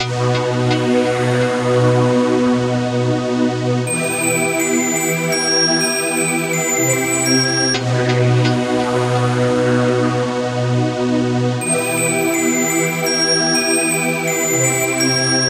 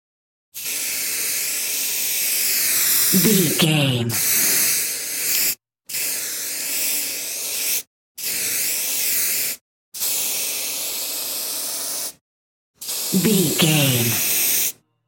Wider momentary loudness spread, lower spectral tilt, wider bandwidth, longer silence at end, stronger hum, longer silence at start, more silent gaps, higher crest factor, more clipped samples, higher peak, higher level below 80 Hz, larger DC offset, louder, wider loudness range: second, 4 LU vs 9 LU; first, -4 dB/octave vs -2.5 dB/octave; about the same, 15.5 kHz vs 17 kHz; second, 0 s vs 0.35 s; neither; second, 0 s vs 0.55 s; second, none vs 7.87-8.15 s, 9.61-9.92 s, 12.21-12.74 s; about the same, 14 dB vs 18 dB; neither; about the same, -2 dBFS vs -4 dBFS; first, -52 dBFS vs -64 dBFS; neither; first, -16 LUFS vs -19 LUFS; second, 2 LU vs 6 LU